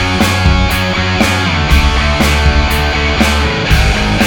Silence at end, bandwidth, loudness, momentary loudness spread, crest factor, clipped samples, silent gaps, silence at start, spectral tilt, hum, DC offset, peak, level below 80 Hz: 0 s; 19.5 kHz; -11 LUFS; 2 LU; 10 dB; under 0.1%; none; 0 s; -4.5 dB/octave; none; under 0.1%; 0 dBFS; -16 dBFS